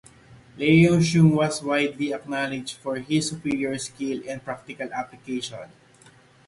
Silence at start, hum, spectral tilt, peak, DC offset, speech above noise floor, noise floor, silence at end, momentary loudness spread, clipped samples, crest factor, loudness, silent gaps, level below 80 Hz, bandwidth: 0.3 s; none; -6 dB/octave; -6 dBFS; under 0.1%; 30 dB; -54 dBFS; 0.8 s; 15 LU; under 0.1%; 18 dB; -24 LUFS; none; -56 dBFS; 11.5 kHz